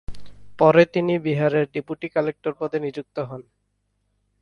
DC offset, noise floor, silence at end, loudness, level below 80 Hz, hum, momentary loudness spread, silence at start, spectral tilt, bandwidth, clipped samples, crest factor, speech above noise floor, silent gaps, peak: under 0.1%; -71 dBFS; 1 s; -22 LUFS; -52 dBFS; 50 Hz at -50 dBFS; 15 LU; 0.1 s; -8 dB/octave; 6.8 kHz; under 0.1%; 22 dB; 50 dB; none; -2 dBFS